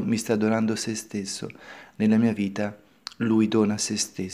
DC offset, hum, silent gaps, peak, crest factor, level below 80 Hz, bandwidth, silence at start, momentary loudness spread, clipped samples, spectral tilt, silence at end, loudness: under 0.1%; none; none; -8 dBFS; 16 dB; -66 dBFS; 15 kHz; 0 s; 17 LU; under 0.1%; -5 dB/octave; 0 s; -25 LUFS